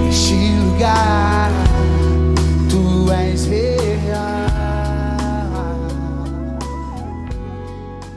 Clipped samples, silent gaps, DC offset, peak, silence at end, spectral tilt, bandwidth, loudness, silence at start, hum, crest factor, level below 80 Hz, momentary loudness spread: under 0.1%; none; under 0.1%; -4 dBFS; 0 s; -6 dB/octave; 11 kHz; -17 LUFS; 0 s; none; 14 dB; -22 dBFS; 13 LU